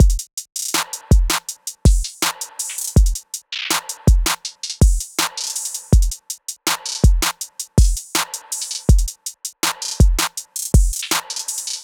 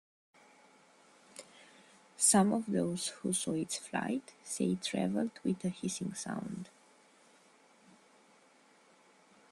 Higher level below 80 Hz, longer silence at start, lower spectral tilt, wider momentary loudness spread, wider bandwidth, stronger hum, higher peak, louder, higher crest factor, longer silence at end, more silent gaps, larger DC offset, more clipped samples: first, -20 dBFS vs -74 dBFS; second, 0 s vs 1.35 s; about the same, -3.5 dB/octave vs -4 dB/octave; second, 9 LU vs 23 LU; first, over 20 kHz vs 14 kHz; neither; first, -2 dBFS vs -14 dBFS; first, -20 LUFS vs -34 LUFS; second, 16 dB vs 22 dB; second, 0 s vs 2.85 s; first, 0.33-0.37 s vs none; neither; neither